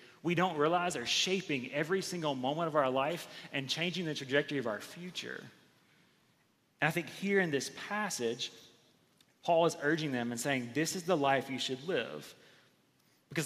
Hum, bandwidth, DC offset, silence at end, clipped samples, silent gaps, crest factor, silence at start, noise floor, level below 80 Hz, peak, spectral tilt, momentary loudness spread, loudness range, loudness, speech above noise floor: none; 15 kHz; under 0.1%; 0 s; under 0.1%; none; 22 dB; 0 s; -72 dBFS; -80 dBFS; -12 dBFS; -4 dB/octave; 11 LU; 5 LU; -33 LUFS; 38 dB